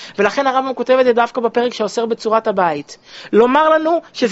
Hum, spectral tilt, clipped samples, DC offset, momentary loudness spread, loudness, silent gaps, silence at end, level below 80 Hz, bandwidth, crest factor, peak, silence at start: none; -3 dB/octave; under 0.1%; under 0.1%; 7 LU; -15 LUFS; none; 0 s; -60 dBFS; 8 kHz; 16 dB; 0 dBFS; 0 s